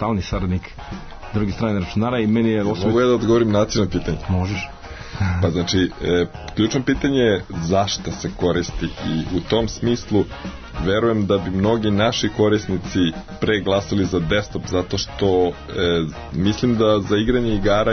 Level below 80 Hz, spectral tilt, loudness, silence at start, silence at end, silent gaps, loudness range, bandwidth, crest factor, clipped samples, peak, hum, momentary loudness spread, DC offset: -36 dBFS; -6 dB/octave; -20 LUFS; 0 s; 0 s; none; 2 LU; 6.6 kHz; 14 dB; under 0.1%; -6 dBFS; none; 8 LU; under 0.1%